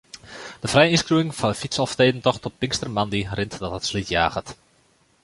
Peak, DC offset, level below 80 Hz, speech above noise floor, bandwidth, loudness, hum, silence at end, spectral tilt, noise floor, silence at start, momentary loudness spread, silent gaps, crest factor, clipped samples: -2 dBFS; under 0.1%; -46 dBFS; 39 dB; 11.5 kHz; -22 LUFS; none; 0.7 s; -4.5 dB/octave; -61 dBFS; 0.15 s; 15 LU; none; 22 dB; under 0.1%